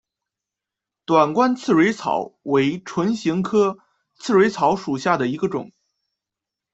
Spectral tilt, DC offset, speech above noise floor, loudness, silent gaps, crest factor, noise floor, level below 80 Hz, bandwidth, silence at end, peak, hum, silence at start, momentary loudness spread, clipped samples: -6 dB/octave; under 0.1%; 67 dB; -20 LUFS; none; 18 dB; -86 dBFS; -62 dBFS; 8.2 kHz; 1.05 s; -4 dBFS; none; 1.1 s; 8 LU; under 0.1%